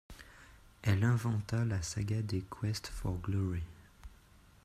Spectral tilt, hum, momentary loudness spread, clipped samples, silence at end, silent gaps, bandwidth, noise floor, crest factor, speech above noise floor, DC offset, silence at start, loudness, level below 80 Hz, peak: -6 dB/octave; none; 20 LU; under 0.1%; 0.55 s; none; 14 kHz; -61 dBFS; 18 dB; 28 dB; under 0.1%; 0.1 s; -35 LUFS; -52 dBFS; -18 dBFS